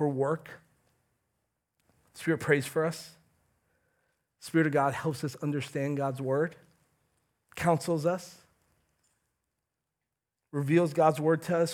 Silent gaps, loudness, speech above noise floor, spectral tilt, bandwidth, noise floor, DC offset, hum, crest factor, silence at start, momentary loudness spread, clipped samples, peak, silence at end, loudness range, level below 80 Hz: none; -29 LUFS; 58 dB; -6.5 dB/octave; 17.5 kHz; -87 dBFS; under 0.1%; none; 22 dB; 0 s; 13 LU; under 0.1%; -10 dBFS; 0 s; 4 LU; -72 dBFS